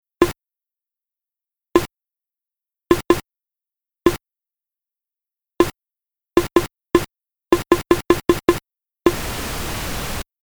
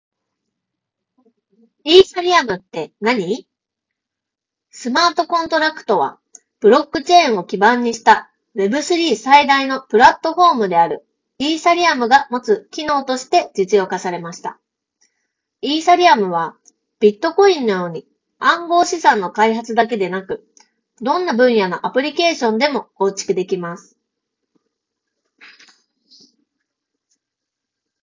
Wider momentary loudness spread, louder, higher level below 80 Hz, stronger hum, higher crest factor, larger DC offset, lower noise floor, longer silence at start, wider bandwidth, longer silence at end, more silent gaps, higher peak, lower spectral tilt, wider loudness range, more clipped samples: second, 9 LU vs 14 LU; second, -20 LUFS vs -16 LUFS; first, -38 dBFS vs -58 dBFS; neither; about the same, 22 dB vs 18 dB; neither; about the same, -87 dBFS vs -84 dBFS; second, 0.2 s vs 1.85 s; first, over 20 kHz vs 7.6 kHz; second, 0.2 s vs 4.25 s; neither; about the same, 0 dBFS vs 0 dBFS; first, -5 dB/octave vs -3.5 dB/octave; about the same, 5 LU vs 6 LU; neither